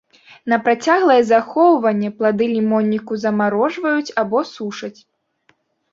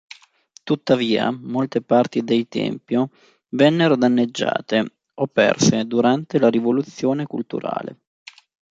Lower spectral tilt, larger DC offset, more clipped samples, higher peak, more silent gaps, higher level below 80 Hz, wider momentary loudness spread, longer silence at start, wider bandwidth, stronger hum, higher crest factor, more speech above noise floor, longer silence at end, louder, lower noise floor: about the same, -6 dB/octave vs -5.5 dB/octave; neither; neither; about the same, -2 dBFS vs -2 dBFS; neither; about the same, -64 dBFS vs -62 dBFS; about the same, 13 LU vs 11 LU; second, 0.45 s vs 0.65 s; about the same, 7.6 kHz vs 7.8 kHz; neither; about the same, 16 dB vs 18 dB; first, 45 dB vs 33 dB; first, 1 s vs 0.8 s; first, -17 LUFS vs -20 LUFS; first, -61 dBFS vs -53 dBFS